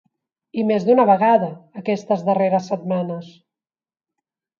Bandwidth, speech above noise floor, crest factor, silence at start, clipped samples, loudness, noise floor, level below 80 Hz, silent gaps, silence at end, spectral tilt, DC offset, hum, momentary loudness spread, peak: 7.2 kHz; over 72 dB; 18 dB; 0.55 s; under 0.1%; -19 LUFS; under -90 dBFS; -70 dBFS; none; 1.3 s; -7.5 dB/octave; under 0.1%; none; 14 LU; -4 dBFS